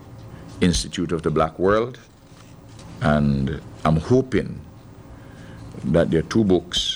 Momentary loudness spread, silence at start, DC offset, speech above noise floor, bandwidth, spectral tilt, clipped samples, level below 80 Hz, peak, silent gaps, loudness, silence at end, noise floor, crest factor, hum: 21 LU; 0 s; under 0.1%; 25 dB; 13.5 kHz; -5.5 dB/octave; under 0.1%; -38 dBFS; -6 dBFS; none; -21 LUFS; 0 s; -45 dBFS; 16 dB; none